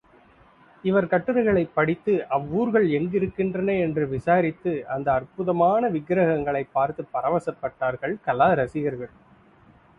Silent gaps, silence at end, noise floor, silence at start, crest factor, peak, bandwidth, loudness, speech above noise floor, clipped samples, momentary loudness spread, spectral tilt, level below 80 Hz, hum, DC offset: none; 0.9 s; -55 dBFS; 0.85 s; 18 dB; -6 dBFS; 9.8 kHz; -24 LUFS; 32 dB; under 0.1%; 7 LU; -9 dB/octave; -54 dBFS; none; under 0.1%